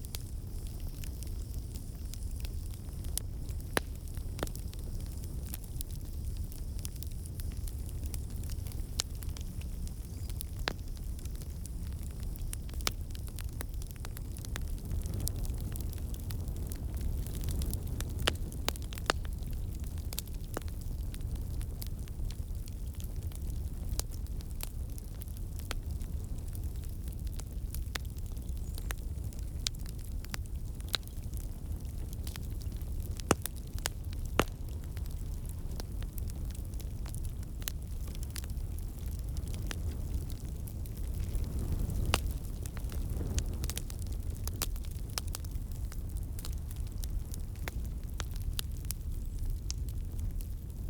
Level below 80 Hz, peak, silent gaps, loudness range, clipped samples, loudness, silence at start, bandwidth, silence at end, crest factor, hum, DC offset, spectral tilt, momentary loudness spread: -38 dBFS; -8 dBFS; none; 4 LU; under 0.1%; -39 LUFS; 0 s; over 20 kHz; 0 s; 28 dB; none; under 0.1%; -4.5 dB/octave; 6 LU